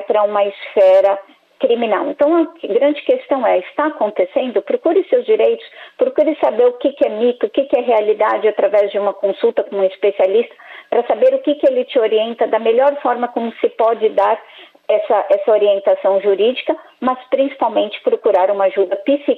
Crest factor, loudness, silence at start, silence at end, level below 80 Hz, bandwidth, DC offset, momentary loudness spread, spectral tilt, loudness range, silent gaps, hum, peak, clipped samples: 12 dB; -16 LUFS; 0 s; 0 s; -68 dBFS; 4.5 kHz; under 0.1%; 6 LU; -6.5 dB/octave; 1 LU; none; none; -4 dBFS; under 0.1%